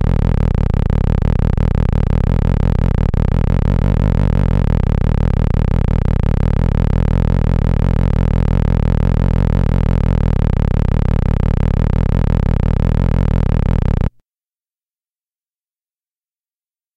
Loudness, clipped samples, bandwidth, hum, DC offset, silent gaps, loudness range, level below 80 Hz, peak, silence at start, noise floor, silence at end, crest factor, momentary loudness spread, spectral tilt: -16 LUFS; under 0.1%; 6 kHz; none; under 0.1%; none; 3 LU; -18 dBFS; -4 dBFS; 0 s; under -90 dBFS; 2.9 s; 10 dB; 1 LU; -9.5 dB/octave